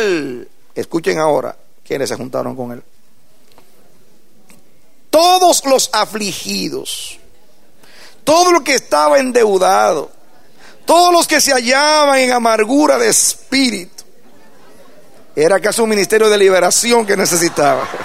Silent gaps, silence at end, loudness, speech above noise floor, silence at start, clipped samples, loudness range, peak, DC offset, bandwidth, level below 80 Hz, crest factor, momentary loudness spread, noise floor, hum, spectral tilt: none; 0 s; -12 LUFS; 42 dB; 0 s; under 0.1%; 9 LU; 0 dBFS; 2%; 16 kHz; -58 dBFS; 14 dB; 15 LU; -54 dBFS; none; -2 dB/octave